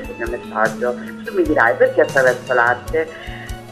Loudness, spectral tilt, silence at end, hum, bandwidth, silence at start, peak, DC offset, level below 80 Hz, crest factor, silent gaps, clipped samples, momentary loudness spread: -17 LUFS; -5 dB/octave; 0 s; none; 13.5 kHz; 0 s; 0 dBFS; 0.2%; -38 dBFS; 18 dB; none; under 0.1%; 14 LU